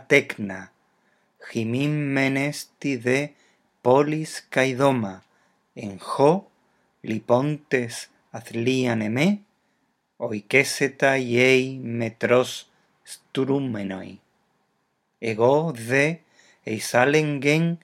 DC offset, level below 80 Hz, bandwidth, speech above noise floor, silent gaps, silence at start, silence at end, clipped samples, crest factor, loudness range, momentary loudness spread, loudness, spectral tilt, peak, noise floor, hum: under 0.1%; -74 dBFS; 16 kHz; 49 dB; none; 0.1 s; 0.05 s; under 0.1%; 22 dB; 4 LU; 16 LU; -23 LUFS; -5.5 dB/octave; -2 dBFS; -72 dBFS; none